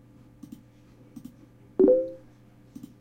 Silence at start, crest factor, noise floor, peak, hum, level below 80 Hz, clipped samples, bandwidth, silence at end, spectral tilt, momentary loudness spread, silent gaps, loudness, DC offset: 1.15 s; 22 dB; -54 dBFS; -8 dBFS; none; -62 dBFS; under 0.1%; 7.2 kHz; 0.85 s; -9 dB/octave; 27 LU; none; -24 LUFS; under 0.1%